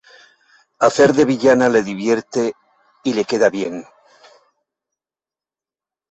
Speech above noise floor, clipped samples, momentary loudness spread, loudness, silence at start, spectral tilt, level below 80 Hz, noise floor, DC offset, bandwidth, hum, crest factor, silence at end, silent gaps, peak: over 74 dB; under 0.1%; 12 LU; -17 LUFS; 0.8 s; -5 dB/octave; -58 dBFS; under -90 dBFS; under 0.1%; 8.2 kHz; none; 18 dB; 2.3 s; none; -2 dBFS